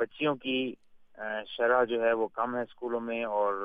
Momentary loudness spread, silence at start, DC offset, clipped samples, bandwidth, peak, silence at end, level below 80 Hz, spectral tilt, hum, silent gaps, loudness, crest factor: 11 LU; 0 s; under 0.1%; under 0.1%; 4.9 kHz; -14 dBFS; 0 s; -72 dBFS; -7.5 dB/octave; none; none; -30 LUFS; 16 dB